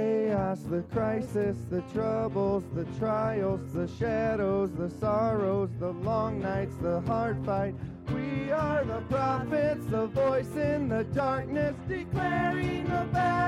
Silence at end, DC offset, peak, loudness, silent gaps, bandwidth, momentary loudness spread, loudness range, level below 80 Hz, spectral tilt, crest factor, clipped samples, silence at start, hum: 0 s; under 0.1%; -16 dBFS; -30 LUFS; none; 13.5 kHz; 5 LU; 1 LU; -50 dBFS; -8 dB/octave; 14 dB; under 0.1%; 0 s; none